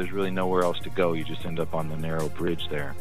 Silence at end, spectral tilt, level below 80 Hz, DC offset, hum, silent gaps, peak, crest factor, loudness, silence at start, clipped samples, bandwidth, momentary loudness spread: 0 s; -6 dB/octave; -48 dBFS; 4%; none; none; -10 dBFS; 18 dB; -28 LUFS; 0 s; under 0.1%; 16 kHz; 7 LU